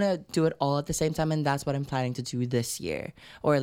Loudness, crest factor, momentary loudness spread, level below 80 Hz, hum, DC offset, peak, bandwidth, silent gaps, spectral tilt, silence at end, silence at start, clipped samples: -29 LUFS; 18 dB; 6 LU; -52 dBFS; none; under 0.1%; -10 dBFS; 16.5 kHz; none; -5.5 dB/octave; 0 s; 0 s; under 0.1%